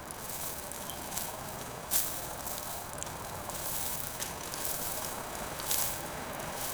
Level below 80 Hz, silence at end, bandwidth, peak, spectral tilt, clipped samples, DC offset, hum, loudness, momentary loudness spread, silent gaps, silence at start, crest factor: -54 dBFS; 0 s; over 20 kHz; -6 dBFS; -2 dB/octave; under 0.1%; under 0.1%; none; -35 LUFS; 9 LU; none; 0 s; 30 dB